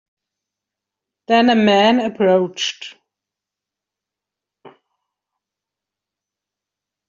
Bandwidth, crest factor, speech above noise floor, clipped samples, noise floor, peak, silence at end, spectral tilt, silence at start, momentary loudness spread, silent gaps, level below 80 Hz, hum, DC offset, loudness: 7.6 kHz; 18 dB; 70 dB; under 0.1%; -85 dBFS; -2 dBFS; 2.4 s; -4.5 dB/octave; 1.3 s; 13 LU; none; -66 dBFS; none; under 0.1%; -15 LUFS